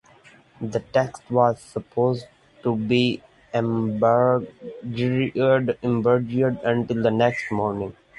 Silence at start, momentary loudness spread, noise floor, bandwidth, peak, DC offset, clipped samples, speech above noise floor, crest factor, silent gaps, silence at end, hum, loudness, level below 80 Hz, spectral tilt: 0.6 s; 11 LU; -52 dBFS; 11.5 kHz; -4 dBFS; under 0.1%; under 0.1%; 30 dB; 18 dB; none; 0.25 s; none; -23 LUFS; -56 dBFS; -7.5 dB/octave